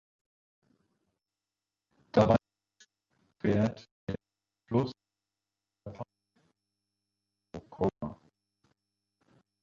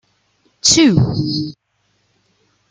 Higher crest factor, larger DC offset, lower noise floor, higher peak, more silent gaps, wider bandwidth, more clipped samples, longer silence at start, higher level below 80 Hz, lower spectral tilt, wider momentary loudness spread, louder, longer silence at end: first, 26 dB vs 18 dB; neither; first, under -90 dBFS vs -64 dBFS; second, -10 dBFS vs 0 dBFS; first, 3.91-4.07 s vs none; second, 7.4 kHz vs 9.6 kHz; neither; first, 2.15 s vs 0.65 s; second, -60 dBFS vs -44 dBFS; first, -8 dB/octave vs -4 dB/octave; first, 22 LU vs 12 LU; second, -31 LUFS vs -14 LUFS; first, 1.5 s vs 1.2 s